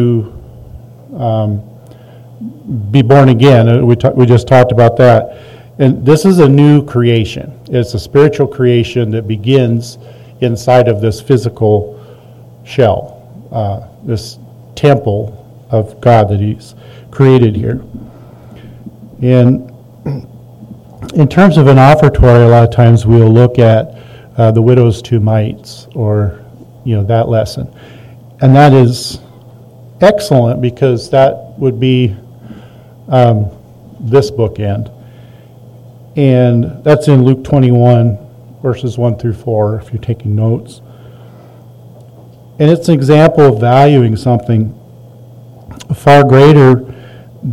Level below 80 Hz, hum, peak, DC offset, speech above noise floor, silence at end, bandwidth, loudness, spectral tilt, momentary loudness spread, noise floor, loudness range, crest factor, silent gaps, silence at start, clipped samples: -34 dBFS; none; 0 dBFS; under 0.1%; 28 dB; 0 s; 12.5 kHz; -9 LUFS; -8 dB/octave; 17 LU; -36 dBFS; 8 LU; 10 dB; none; 0 s; 4%